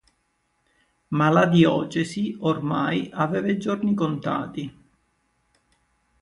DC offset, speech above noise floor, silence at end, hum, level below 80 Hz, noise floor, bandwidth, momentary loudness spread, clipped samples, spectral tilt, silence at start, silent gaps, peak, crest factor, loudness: under 0.1%; 48 dB; 1.5 s; none; -62 dBFS; -71 dBFS; 11 kHz; 11 LU; under 0.1%; -7 dB/octave; 1.1 s; none; -4 dBFS; 20 dB; -23 LUFS